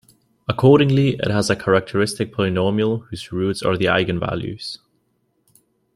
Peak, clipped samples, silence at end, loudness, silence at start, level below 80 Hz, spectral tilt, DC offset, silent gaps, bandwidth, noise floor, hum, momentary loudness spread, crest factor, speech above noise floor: -2 dBFS; under 0.1%; 1.2 s; -19 LUFS; 0.5 s; -50 dBFS; -6 dB/octave; under 0.1%; none; 12.5 kHz; -67 dBFS; none; 15 LU; 18 dB; 48 dB